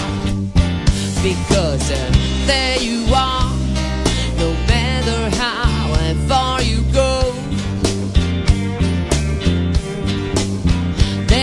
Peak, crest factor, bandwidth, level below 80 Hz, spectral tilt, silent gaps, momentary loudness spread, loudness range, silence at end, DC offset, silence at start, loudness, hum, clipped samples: 0 dBFS; 16 dB; 12 kHz; -22 dBFS; -5 dB/octave; none; 4 LU; 2 LU; 0 s; under 0.1%; 0 s; -17 LUFS; none; under 0.1%